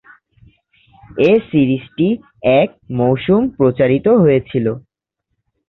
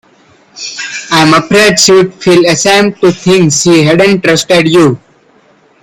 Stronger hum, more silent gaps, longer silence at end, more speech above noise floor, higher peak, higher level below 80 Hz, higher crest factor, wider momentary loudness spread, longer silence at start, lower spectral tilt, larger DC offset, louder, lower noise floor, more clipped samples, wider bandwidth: neither; neither; about the same, 0.9 s vs 0.85 s; first, 61 dB vs 39 dB; about the same, -2 dBFS vs 0 dBFS; about the same, -48 dBFS vs -46 dBFS; first, 14 dB vs 8 dB; second, 8 LU vs 13 LU; first, 1.15 s vs 0.55 s; first, -10 dB/octave vs -4 dB/octave; neither; second, -15 LUFS vs -7 LUFS; first, -75 dBFS vs -45 dBFS; second, under 0.1% vs 0.5%; second, 5.8 kHz vs 19 kHz